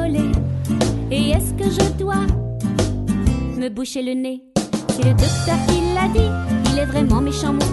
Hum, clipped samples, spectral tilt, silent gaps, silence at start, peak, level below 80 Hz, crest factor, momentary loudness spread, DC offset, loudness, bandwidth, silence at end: none; under 0.1%; -6 dB/octave; none; 0 s; -2 dBFS; -26 dBFS; 16 dB; 6 LU; under 0.1%; -19 LUFS; 12.5 kHz; 0 s